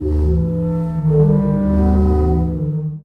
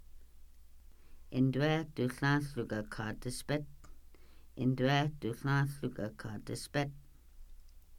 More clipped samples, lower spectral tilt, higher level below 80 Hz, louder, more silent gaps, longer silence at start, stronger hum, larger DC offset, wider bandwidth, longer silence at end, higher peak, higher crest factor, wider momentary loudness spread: neither; first, -11.5 dB/octave vs -6 dB/octave; first, -22 dBFS vs -54 dBFS; first, -16 LUFS vs -35 LUFS; neither; about the same, 0 s vs 0 s; neither; neither; second, 2.6 kHz vs 16 kHz; about the same, 0.05 s vs 0 s; first, -4 dBFS vs -18 dBFS; second, 12 dB vs 18 dB; second, 6 LU vs 11 LU